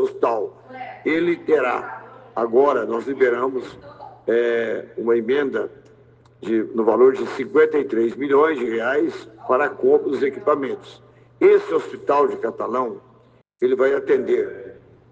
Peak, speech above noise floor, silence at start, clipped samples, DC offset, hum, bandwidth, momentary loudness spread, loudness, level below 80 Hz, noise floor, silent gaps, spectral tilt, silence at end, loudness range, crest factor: -4 dBFS; 34 dB; 0 s; under 0.1%; under 0.1%; none; 7.8 kHz; 15 LU; -20 LUFS; -66 dBFS; -54 dBFS; none; -6.5 dB/octave; 0.4 s; 3 LU; 18 dB